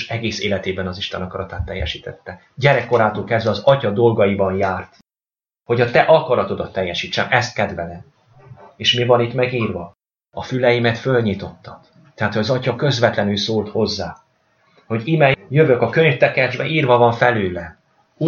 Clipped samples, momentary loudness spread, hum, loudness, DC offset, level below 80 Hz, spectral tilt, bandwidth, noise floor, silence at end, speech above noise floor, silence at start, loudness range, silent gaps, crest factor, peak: under 0.1%; 14 LU; none; -18 LUFS; under 0.1%; -46 dBFS; -6 dB/octave; 7.2 kHz; under -90 dBFS; 0 s; over 72 dB; 0 s; 5 LU; none; 18 dB; 0 dBFS